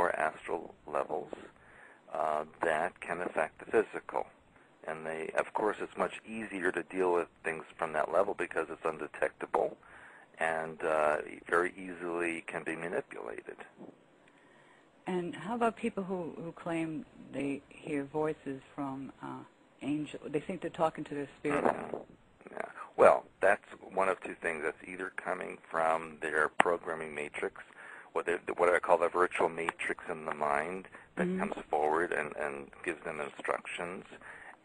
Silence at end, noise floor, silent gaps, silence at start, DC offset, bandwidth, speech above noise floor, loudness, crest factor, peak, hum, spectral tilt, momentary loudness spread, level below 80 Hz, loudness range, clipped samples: 0.1 s; -62 dBFS; none; 0 s; under 0.1%; 11 kHz; 28 dB; -34 LUFS; 30 dB; -4 dBFS; none; -5.5 dB/octave; 14 LU; -68 dBFS; 7 LU; under 0.1%